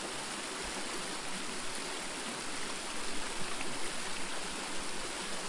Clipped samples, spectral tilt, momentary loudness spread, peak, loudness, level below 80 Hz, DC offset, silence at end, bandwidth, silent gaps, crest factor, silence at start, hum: under 0.1%; -1.5 dB/octave; 1 LU; -22 dBFS; -38 LUFS; -56 dBFS; under 0.1%; 0 s; 11.5 kHz; none; 14 dB; 0 s; none